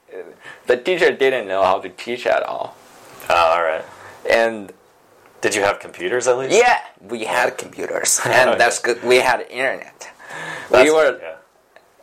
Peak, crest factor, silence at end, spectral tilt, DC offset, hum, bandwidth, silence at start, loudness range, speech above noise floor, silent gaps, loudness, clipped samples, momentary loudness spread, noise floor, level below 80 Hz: 0 dBFS; 18 dB; 0.65 s; -2.5 dB/octave; under 0.1%; none; 16.5 kHz; 0.1 s; 4 LU; 35 dB; none; -17 LUFS; under 0.1%; 18 LU; -52 dBFS; -58 dBFS